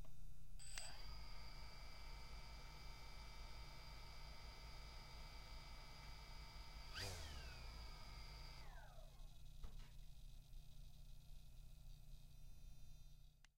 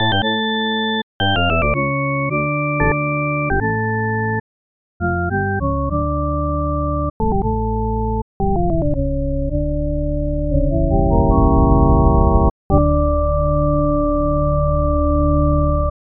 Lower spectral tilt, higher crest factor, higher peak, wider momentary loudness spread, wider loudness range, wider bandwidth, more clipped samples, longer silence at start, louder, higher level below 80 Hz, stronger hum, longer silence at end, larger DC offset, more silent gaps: second, -3 dB/octave vs -5.5 dB/octave; about the same, 20 dB vs 16 dB; second, -34 dBFS vs 0 dBFS; first, 11 LU vs 7 LU; first, 8 LU vs 5 LU; first, 16 kHz vs 3.8 kHz; neither; about the same, 0 s vs 0 s; second, -59 LUFS vs -18 LUFS; second, -58 dBFS vs -22 dBFS; first, 60 Hz at -70 dBFS vs none; second, 0 s vs 0.3 s; neither; second, none vs 1.03-1.20 s, 4.40-5.00 s, 7.10-7.20 s, 8.22-8.40 s, 12.51-12.70 s